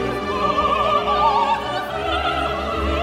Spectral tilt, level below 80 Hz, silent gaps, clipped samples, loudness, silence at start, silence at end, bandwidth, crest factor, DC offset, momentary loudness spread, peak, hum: -5 dB/octave; -34 dBFS; none; under 0.1%; -20 LUFS; 0 s; 0 s; 16 kHz; 14 dB; under 0.1%; 6 LU; -6 dBFS; none